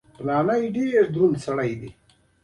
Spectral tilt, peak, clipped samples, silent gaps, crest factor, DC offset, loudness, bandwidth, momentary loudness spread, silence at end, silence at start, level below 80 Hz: -7.5 dB/octave; -8 dBFS; under 0.1%; none; 16 dB; under 0.1%; -22 LUFS; 11 kHz; 10 LU; 0.5 s; 0.2 s; -58 dBFS